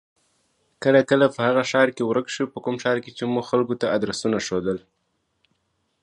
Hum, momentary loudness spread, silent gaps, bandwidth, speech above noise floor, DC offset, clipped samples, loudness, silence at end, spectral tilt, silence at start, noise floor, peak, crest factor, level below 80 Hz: none; 8 LU; none; 11 kHz; 51 dB; under 0.1%; under 0.1%; -22 LUFS; 1.25 s; -5 dB/octave; 0.8 s; -72 dBFS; -2 dBFS; 20 dB; -62 dBFS